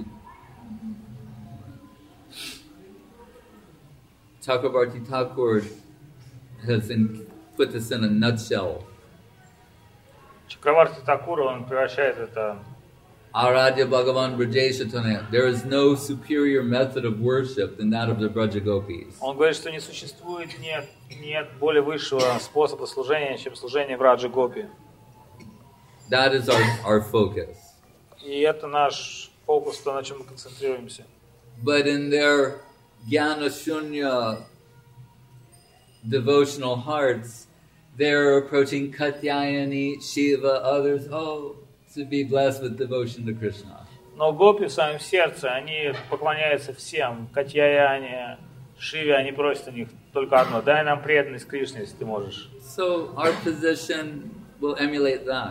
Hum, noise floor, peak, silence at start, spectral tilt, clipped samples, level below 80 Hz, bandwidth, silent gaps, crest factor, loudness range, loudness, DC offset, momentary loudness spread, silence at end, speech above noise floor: none; -54 dBFS; -2 dBFS; 0 s; -5.5 dB/octave; under 0.1%; -62 dBFS; 16 kHz; none; 22 dB; 5 LU; -24 LUFS; under 0.1%; 17 LU; 0 s; 31 dB